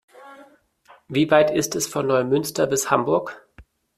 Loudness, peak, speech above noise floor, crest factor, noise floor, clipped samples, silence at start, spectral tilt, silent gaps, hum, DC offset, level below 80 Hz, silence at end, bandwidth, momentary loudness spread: -21 LUFS; -2 dBFS; 34 dB; 20 dB; -54 dBFS; under 0.1%; 0.2 s; -4.5 dB/octave; none; none; under 0.1%; -58 dBFS; 0.35 s; 15.5 kHz; 7 LU